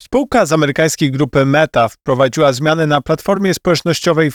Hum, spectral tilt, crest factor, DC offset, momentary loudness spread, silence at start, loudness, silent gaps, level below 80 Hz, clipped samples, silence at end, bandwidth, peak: none; -5 dB/octave; 12 dB; 0.1%; 3 LU; 0.1 s; -14 LUFS; none; -42 dBFS; under 0.1%; 0 s; 19 kHz; 0 dBFS